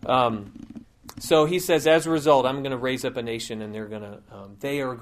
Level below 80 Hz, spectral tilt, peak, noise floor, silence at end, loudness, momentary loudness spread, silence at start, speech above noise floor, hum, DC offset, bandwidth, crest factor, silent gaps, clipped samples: -56 dBFS; -4.5 dB/octave; -4 dBFS; -44 dBFS; 0 s; -23 LUFS; 23 LU; 0.05 s; 20 dB; none; under 0.1%; 15.5 kHz; 20 dB; none; under 0.1%